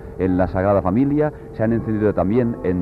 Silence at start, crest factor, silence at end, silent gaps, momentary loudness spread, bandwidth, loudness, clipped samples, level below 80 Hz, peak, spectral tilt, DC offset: 0 s; 14 dB; 0 s; none; 4 LU; 5 kHz; -19 LUFS; under 0.1%; -40 dBFS; -6 dBFS; -11 dB/octave; under 0.1%